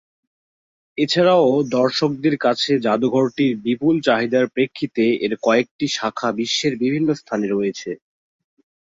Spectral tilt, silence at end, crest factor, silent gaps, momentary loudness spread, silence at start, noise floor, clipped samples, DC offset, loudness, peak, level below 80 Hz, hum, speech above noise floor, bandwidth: -5 dB/octave; 0.85 s; 16 dB; 5.71-5.79 s; 6 LU; 0.95 s; under -90 dBFS; under 0.1%; under 0.1%; -19 LUFS; -2 dBFS; -62 dBFS; none; over 71 dB; 7.8 kHz